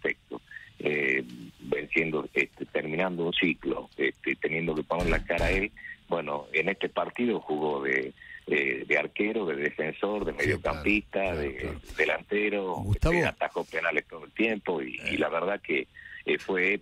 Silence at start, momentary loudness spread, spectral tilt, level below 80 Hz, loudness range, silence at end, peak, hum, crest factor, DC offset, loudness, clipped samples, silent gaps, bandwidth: 0.05 s; 8 LU; -6 dB/octave; -44 dBFS; 1 LU; 0 s; -10 dBFS; none; 20 dB; under 0.1%; -29 LUFS; under 0.1%; none; 15 kHz